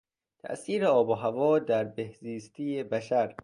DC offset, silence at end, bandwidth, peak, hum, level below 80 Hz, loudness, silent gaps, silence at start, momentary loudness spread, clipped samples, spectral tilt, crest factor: under 0.1%; 0.1 s; 11 kHz; -12 dBFS; none; -70 dBFS; -28 LUFS; none; 0.45 s; 15 LU; under 0.1%; -6.5 dB/octave; 16 dB